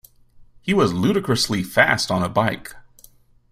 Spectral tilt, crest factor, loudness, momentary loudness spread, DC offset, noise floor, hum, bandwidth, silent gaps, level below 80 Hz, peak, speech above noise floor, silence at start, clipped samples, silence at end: -4.5 dB/octave; 22 dB; -19 LUFS; 13 LU; under 0.1%; -52 dBFS; none; 16 kHz; none; -50 dBFS; 0 dBFS; 32 dB; 0.4 s; under 0.1%; 0.7 s